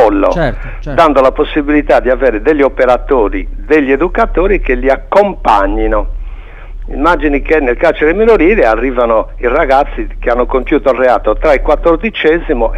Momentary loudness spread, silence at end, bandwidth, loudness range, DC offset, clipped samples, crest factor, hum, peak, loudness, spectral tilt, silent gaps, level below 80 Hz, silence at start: 7 LU; 0 s; 7.8 kHz; 2 LU; under 0.1%; under 0.1%; 10 dB; none; 0 dBFS; -11 LUFS; -7 dB/octave; none; -20 dBFS; 0 s